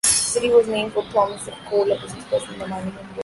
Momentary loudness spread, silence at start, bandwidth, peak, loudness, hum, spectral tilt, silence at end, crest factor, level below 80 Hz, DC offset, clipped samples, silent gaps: 13 LU; 0.05 s; 12 kHz; -4 dBFS; -21 LUFS; none; -2.5 dB/octave; 0 s; 18 dB; -52 dBFS; under 0.1%; under 0.1%; none